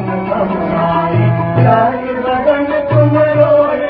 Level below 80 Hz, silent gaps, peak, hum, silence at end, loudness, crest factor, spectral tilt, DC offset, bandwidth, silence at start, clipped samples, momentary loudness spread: -40 dBFS; none; 0 dBFS; none; 0 s; -12 LUFS; 12 dB; -12 dB/octave; under 0.1%; 4.9 kHz; 0 s; under 0.1%; 6 LU